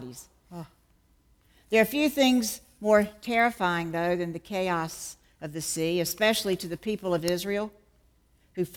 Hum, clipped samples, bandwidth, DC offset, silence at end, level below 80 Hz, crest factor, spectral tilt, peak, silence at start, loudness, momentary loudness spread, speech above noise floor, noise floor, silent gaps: none; under 0.1%; 19.5 kHz; under 0.1%; 0 s; -60 dBFS; 20 dB; -4 dB/octave; -8 dBFS; 0 s; -27 LUFS; 19 LU; 37 dB; -64 dBFS; none